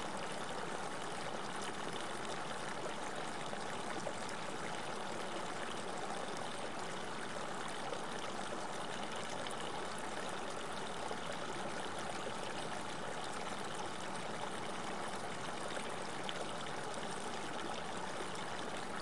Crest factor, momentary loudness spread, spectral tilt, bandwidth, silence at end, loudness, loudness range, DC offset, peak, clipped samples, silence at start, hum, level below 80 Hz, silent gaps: 20 dB; 1 LU; -3 dB/octave; 11.5 kHz; 0 s; -43 LUFS; 0 LU; 0.5%; -24 dBFS; under 0.1%; 0 s; none; -72 dBFS; none